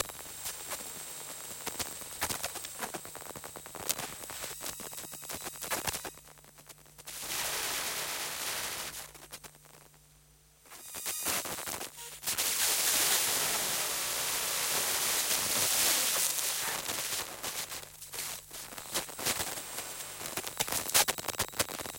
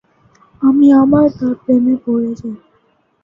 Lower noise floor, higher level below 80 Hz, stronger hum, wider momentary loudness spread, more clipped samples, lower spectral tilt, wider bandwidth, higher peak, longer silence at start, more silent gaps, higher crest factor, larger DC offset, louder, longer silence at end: first, -62 dBFS vs -58 dBFS; second, -64 dBFS vs -48 dBFS; neither; about the same, 16 LU vs 17 LU; neither; second, 0 dB/octave vs -9.5 dB/octave; first, 17 kHz vs 5.6 kHz; second, -6 dBFS vs -2 dBFS; second, 0 s vs 0.6 s; neither; first, 28 dB vs 12 dB; neither; second, -32 LUFS vs -13 LUFS; second, 0 s vs 0.65 s